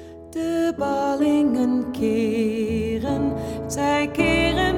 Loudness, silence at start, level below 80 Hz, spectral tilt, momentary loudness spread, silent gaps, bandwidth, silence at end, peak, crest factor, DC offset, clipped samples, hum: -22 LUFS; 0 s; -40 dBFS; -5.5 dB/octave; 7 LU; none; 16 kHz; 0 s; -6 dBFS; 16 dB; under 0.1%; under 0.1%; none